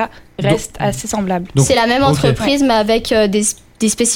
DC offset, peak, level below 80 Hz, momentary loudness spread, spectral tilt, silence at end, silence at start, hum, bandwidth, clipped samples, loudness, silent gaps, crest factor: under 0.1%; 0 dBFS; -36 dBFS; 7 LU; -4.5 dB/octave; 0 s; 0 s; none; 17 kHz; under 0.1%; -15 LUFS; none; 14 dB